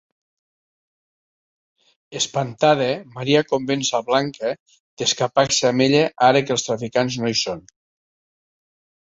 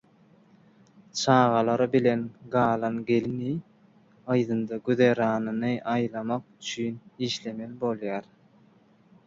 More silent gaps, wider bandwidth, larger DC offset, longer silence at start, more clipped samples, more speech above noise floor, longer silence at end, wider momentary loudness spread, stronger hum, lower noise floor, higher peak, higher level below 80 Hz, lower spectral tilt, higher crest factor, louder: first, 4.60-4.66 s, 4.80-4.97 s vs none; about the same, 8.2 kHz vs 7.8 kHz; neither; first, 2.1 s vs 1.15 s; neither; first, over 70 dB vs 33 dB; first, 1.4 s vs 1.05 s; about the same, 10 LU vs 12 LU; neither; first, under -90 dBFS vs -59 dBFS; first, -2 dBFS vs -8 dBFS; first, -60 dBFS vs -66 dBFS; second, -3.5 dB/octave vs -6 dB/octave; about the same, 20 dB vs 20 dB; first, -20 LUFS vs -27 LUFS